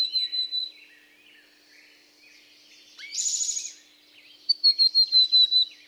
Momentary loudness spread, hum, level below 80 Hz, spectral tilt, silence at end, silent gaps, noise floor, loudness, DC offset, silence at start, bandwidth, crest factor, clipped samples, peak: 19 LU; none; -90 dBFS; 5.5 dB/octave; 0.2 s; none; -56 dBFS; -20 LUFS; under 0.1%; 0 s; over 20 kHz; 16 dB; under 0.1%; -12 dBFS